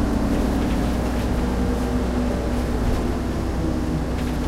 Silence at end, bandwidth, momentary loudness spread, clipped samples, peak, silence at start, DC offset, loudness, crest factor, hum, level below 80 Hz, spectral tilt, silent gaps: 0 s; 15.5 kHz; 3 LU; under 0.1%; -10 dBFS; 0 s; under 0.1%; -23 LUFS; 12 dB; none; -26 dBFS; -7 dB/octave; none